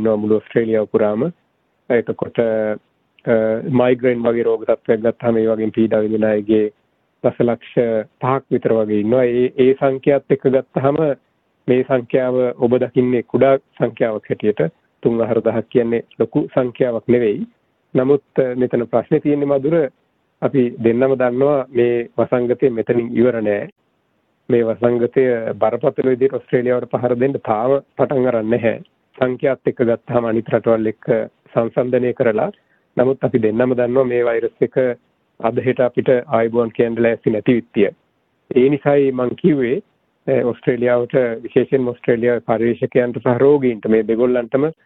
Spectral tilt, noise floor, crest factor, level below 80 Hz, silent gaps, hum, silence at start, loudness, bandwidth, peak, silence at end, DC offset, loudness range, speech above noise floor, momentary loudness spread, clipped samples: -10.5 dB/octave; -64 dBFS; 16 dB; -56 dBFS; 23.72-23.76 s; none; 0 s; -17 LUFS; 4 kHz; -2 dBFS; 0.15 s; under 0.1%; 2 LU; 48 dB; 5 LU; under 0.1%